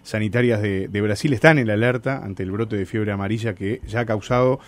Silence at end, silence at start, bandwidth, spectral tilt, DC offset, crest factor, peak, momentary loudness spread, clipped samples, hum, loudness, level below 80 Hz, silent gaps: 0.1 s; 0.05 s; 13.5 kHz; -7 dB/octave; under 0.1%; 20 dB; 0 dBFS; 10 LU; under 0.1%; none; -21 LUFS; -48 dBFS; none